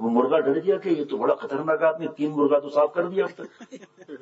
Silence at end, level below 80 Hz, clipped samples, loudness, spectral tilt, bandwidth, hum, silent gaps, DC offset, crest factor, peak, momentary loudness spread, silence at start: 0.05 s; -78 dBFS; under 0.1%; -23 LUFS; -7.5 dB/octave; 7.8 kHz; none; none; under 0.1%; 16 dB; -8 dBFS; 8 LU; 0 s